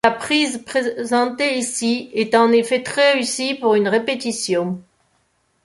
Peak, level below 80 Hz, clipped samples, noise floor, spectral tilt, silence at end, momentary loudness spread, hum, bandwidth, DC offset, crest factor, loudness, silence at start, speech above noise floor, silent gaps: -2 dBFS; -62 dBFS; under 0.1%; -64 dBFS; -3 dB/octave; 0.85 s; 6 LU; none; 11.5 kHz; under 0.1%; 18 dB; -18 LUFS; 0.05 s; 46 dB; none